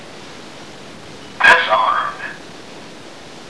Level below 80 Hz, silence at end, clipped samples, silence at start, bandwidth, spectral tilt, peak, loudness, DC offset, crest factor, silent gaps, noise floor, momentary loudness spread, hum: -58 dBFS; 0 s; under 0.1%; 0 s; 11 kHz; -2 dB/octave; 0 dBFS; -13 LUFS; 0.8%; 20 dB; none; -37 dBFS; 25 LU; none